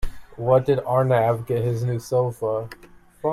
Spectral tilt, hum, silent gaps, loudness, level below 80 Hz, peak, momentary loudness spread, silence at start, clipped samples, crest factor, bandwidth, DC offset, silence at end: -7.5 dB/octave; none; none; -22 LUFS; -40 dBFS; -6 dBFS; 10 LU; 0 s; under 0.1%; 16 dB; 14 kHz; under 0.1%; 0 s